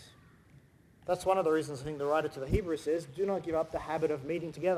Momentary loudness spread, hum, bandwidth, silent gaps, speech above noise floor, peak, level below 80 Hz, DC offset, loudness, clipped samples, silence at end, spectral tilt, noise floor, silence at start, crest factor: 7 LU; none; 15 kHz; none; 28 dB; -16 dBFS; -50 dBFS; under 0.1%; -33 LUFS; under 0.1%; 0 s; -6.5 dB/octave; -60 dBFS; 0 s; 18 dB